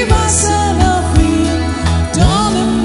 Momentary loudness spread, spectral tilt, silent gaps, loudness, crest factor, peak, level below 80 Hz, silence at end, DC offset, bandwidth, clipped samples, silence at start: 4 LU; -5 dB/octave; none; -13 LUFS; 12 dB; 0 dBFS; -18 dBFS; 0 s; under 0.1%; 11.5 kHz; under 0.1%; 0 s